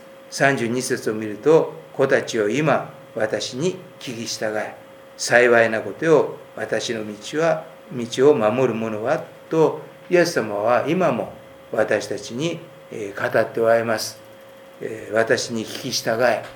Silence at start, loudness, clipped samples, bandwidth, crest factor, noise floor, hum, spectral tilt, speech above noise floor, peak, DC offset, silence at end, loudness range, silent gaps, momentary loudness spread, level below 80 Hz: 0 s; -21 LUFS; under 0.1%; 19.5 kHz; 22 dB; -44 dBFS; none; -4.5 dB/octave; 23 dB; 0 dBFS; under 0.1%; 0 s; 3 LU; none; 14 LU; -68 dBFS